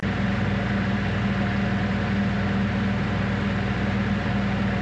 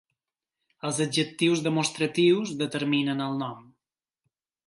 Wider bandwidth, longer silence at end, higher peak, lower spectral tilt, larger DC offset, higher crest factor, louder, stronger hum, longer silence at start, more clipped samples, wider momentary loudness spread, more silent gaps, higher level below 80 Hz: second, 8 kHz vs 11.5 kHz; second, 0 s vs 1.05 s; about the same, -12 dBFS vs -10 dBFS; first, -7.5 dB/octave vs -4.5 dB/octave; neither; second, 12 dB vs 18 dB; about the same, -24 LUFS vs -26 LUFS; neither; second, 0 s vs 0.85 s; neither; second, 1 LU vs 9 LU; neither; first, -36 dBFS vs -74 dBFS